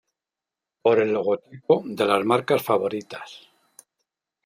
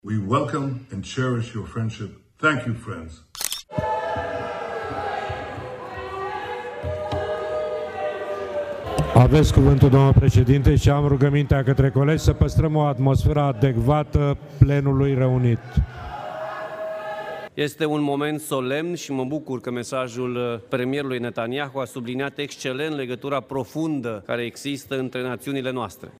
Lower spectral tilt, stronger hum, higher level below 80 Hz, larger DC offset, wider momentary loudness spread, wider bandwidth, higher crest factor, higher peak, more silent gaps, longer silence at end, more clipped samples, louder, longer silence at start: second, -5.5 dB/octave vs -7 dB/octave; neither; second, -74 dBFS vs -34 dBFS; neither; about the same, 14 LU vs 14 LU; about the same, 16 kHz vs 15.5 kHz; about the same, 20 dB vs 22 dB; second, -4 dBFS vs 0 dBFS; neither; first, 1.1 s vs 0.1 s; neither; about the same, -23 LUFS vs -23 LUFS; first, 0.85 s vs 0.05 s